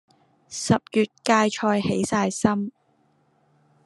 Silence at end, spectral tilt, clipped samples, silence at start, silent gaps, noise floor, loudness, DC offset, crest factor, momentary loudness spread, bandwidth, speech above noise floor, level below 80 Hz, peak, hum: 1.15 s; -5 dB/octave; under 0.1%; 0.5 s; none; -64 dBFS; -23 LUFS; under 0.1%; 20 dB; 10 LU; 12 kHz; 42 dB; -60 dBFS; -4 dBFS; none